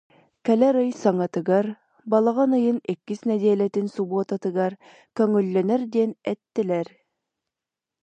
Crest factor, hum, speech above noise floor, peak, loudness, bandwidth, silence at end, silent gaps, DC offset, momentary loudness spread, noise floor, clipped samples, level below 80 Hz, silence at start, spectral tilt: 16 dB; none; 66 dB; -6 dBFS; -23 LUFS; 8.6 kHz; 1.2 s; none; under 0.1%; 9 LU; -88 dBFS; under 0.1%; -76 dBFS; 0.45 s; -8 dB/octave